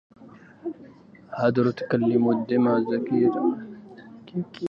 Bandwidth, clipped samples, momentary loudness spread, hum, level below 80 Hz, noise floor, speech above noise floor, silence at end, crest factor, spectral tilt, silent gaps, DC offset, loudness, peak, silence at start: 5.8 kHz; under 0.1%; 21 LU; none; -68 dBFS; -49 dBFS; 26 dB; 0 s; 16 dB; -9.5 dB/octave; none; under 0.1%; -23 LUFS; -8 dBFS; 0.2 s